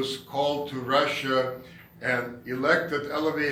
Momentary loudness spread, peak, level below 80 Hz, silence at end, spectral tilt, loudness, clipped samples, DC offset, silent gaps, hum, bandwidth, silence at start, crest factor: 9 LU; -8 dBFS; -64 dBFS; 0 s; -4.5 dB/octave; -27 LUFS; under 0.1%; under 0.1%; none; none; 17 kHz; 0 s; 18 dB